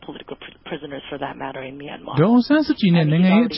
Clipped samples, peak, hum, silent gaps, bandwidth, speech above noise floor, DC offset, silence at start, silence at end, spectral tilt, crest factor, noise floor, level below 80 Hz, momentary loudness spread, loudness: under 0.1%; -6 dBFS; none; none; 5.8 kHz; 19 dB; under 0.1%; 0 s; 0 s; -11.5 dB/octave; 14 dB; -38 dBFS; -54 dBFS; 20 LU; -18 LUFS